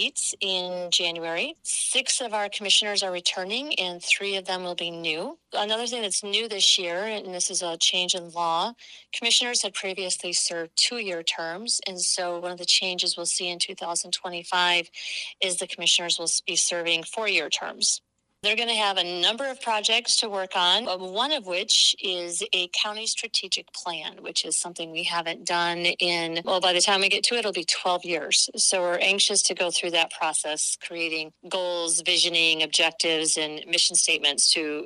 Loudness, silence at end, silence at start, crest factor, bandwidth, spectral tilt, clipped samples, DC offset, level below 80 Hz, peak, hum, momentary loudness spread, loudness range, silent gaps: -23 LUFS; 0 s; 0 s; 16 dB; 13 kHz; 0 dB/octave; under 0.1%; under 0.1%; -78 dBFS; -8 dBFS; none; 9 LU; 3 LU; none